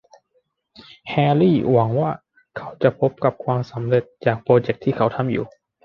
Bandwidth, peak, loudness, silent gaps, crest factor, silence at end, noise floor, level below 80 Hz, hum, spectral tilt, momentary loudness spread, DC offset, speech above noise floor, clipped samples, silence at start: 6.2 kHz; -2 dBFS; -20 LUFS; none; 20 dB; 0.4 s; -67 dBFS; -56 dBFS; none; -9.5 dB/octave; 18 LU; under 0.1%; 48 dB; under 0.1%; 0.8 s